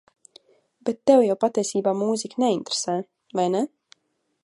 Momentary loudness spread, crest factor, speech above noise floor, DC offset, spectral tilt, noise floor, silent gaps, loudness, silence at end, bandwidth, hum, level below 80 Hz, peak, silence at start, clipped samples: 12 LU; 20 dB; 51 dB; under 0.1%; -4.5 dB/octave; -73 dBFS; none; -23 LUFS; 0.8 s; 11.5 kHz; none; -74 dBFS; -4 dBFS; 0.85 s; under 0.1%